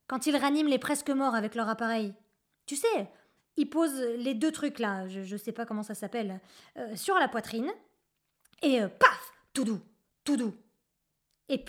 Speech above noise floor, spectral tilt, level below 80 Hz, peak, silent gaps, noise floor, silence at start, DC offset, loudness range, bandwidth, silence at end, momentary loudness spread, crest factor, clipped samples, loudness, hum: 51 dB; -4 dB/octave; -74 dBFS; -6 dBFS; none; -80 dBFS; 0.1 s; under 0.1%; 4 LU; 17 kHz; 0 s; 13 LU; 26 dB; under 0.1%; -30 LUFS; none